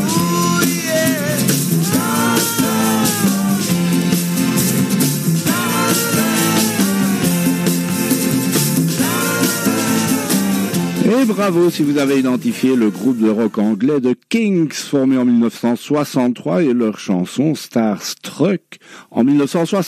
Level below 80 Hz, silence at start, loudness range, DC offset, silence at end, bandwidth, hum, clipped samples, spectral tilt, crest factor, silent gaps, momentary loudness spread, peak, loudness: -56 dBFS; 0 s; 2 LU; under 0.1%; 0 s; 16 kHz; none; under 0.1%; -4.5 dB/octave; 14 dB; none; 4 LU; -2 dBFS; -16 LUFS